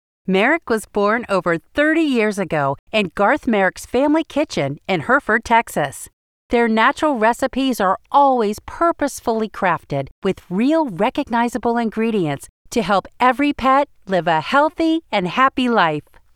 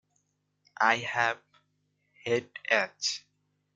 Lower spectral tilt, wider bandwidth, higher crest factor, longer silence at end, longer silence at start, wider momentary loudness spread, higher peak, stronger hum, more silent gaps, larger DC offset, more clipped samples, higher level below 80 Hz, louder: first, -5 dB/octave vs -2 dB/octave; first, 16 kHz vs 9.6 kHz; second, 16 dB vs 24 dB; second, 0.35 s vs 0.55 s; second, 0.25 s vs 0.8 s; second, 7 LU vs 13 LU; first, -2 dBFS vs -8 dBFS; second, none vs 50 Hz at -75 dBFS; first, 2.79-2.87 s, 6.13-6.49 s, 10.11-10.22 s, 12.49-12.65 s vs none; neither; neither; first, -48 dBFS vs -78 dBFS; first, -18 LUFS vs -29 LUFS